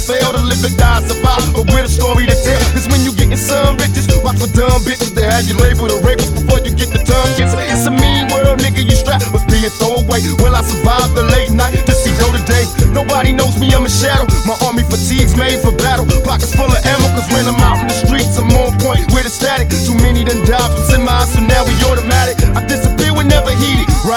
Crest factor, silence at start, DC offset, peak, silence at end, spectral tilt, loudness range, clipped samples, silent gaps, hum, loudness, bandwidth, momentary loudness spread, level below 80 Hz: 10 dB; 0 s; under 0.1%; 0 dBFS; 0 s; -5 dB/octave; 1 LU; 0.3%; none; none; -12 LUFS; 19.5 kHz; 2 LU; -16 dBFS